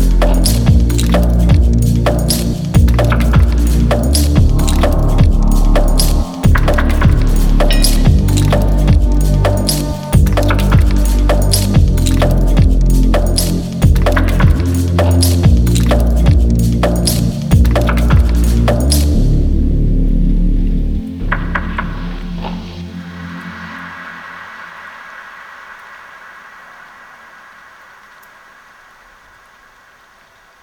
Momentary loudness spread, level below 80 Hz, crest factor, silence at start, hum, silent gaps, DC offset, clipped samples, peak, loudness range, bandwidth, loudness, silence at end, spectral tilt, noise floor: 16 LU; -14 dBFS; 12 dB; 0 s; none; none; under 0.1%; under 0.1%; 0 dBFS; 16 LU; over 20 kHz; -13 LUFS; 4.35 s; -6 dB/octave; -46 dBFS